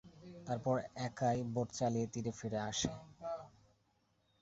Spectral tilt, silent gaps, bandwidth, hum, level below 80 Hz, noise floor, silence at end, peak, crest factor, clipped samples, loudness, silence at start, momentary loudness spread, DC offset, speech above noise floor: -5.5 dB/octave; none; 8 kHz; none; -66 dBFS; -77 dBFS; 0.9 s; -22 dBFS; 18 dB; under 0.1%; -39 LUFS; 0.05 s; 11 LU; under 0.1%; 39 dB